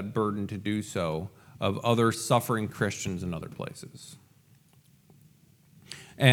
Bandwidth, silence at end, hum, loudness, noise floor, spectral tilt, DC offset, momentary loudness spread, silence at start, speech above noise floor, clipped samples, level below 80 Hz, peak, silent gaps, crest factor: 17.5 kHz; 0 s; none; -29 LUFS; -61 dBFS; -5 dB/octave; under 0.1%; 20 LU; 0 s; 31 dB; under 0.1%; -64 dBFS; -4 dBFS; none; 26 dB